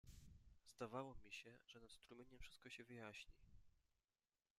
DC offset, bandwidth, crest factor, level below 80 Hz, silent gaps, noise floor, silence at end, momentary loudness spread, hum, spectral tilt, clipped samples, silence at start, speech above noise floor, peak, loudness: under 0.1%; 14.5 kHz; 22 dB; -72 dBFS; none; under -90 dBFS; 0.8 s; 13 LU; none; -4.5 dB/octave; under 0.1%; 0.05 s; over 32 dB; -38 dBFS; -59 LUFS